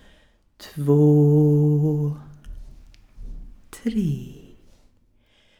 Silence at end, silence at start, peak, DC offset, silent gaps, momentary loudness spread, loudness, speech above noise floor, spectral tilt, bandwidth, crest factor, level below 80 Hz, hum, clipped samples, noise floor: 1.25 s; 0.6 s; -8 dBFS; under 0.1%; none; 24 LU; -20 LUFS; 42 dB; -10 dB/octave; 8.4 kHz; 16 dB; -44 dBFS; none; under 0.1%; -60 dBFS